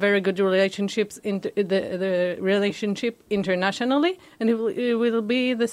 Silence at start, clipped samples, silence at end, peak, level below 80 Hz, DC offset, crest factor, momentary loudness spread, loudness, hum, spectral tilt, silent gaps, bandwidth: 0 s; under 0.1%; 0 s; -8 dBFS; -66 dBFS; under 0.1%; 16 dB; 5 LU; -24 LUFS; none; -5.5 dB/octave; none; 13.5 kHz